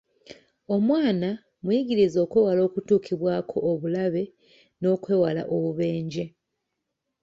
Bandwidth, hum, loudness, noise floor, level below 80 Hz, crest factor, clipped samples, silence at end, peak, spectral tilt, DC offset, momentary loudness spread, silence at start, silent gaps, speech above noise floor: 7.6 kHz; none; -25 LUFS; -81 dBFS; -64 dBFS; 16 dB; under 0.1%; 0.95 s; -8 dBFS; -8 dB/octave; under 0.1%; 9 LU; 0.3 s; none; 57 dB